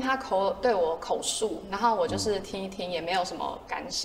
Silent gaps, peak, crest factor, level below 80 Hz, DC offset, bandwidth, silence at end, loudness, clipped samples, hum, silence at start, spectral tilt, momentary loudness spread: none; -12 dBFS; 16 dB; -54 dBFS; under 0.1%; 16 kHz; 0 s; -29 LUFS; under 0.1%; none; 0 s; -3 dB/octave; 8 LU